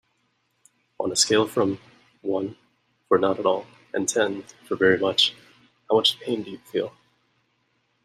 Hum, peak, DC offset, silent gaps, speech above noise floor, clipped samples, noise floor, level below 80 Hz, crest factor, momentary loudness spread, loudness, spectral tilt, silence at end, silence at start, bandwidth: none; -4 dBFS; under 0.1%; none; 47 dB; under 0.1%; -71 dBFS; -68 dBFS; 20 dB; 13 LU; -23 LUFS; -2.5 dB/octave; 1.15 s; 1 s; 15 kHz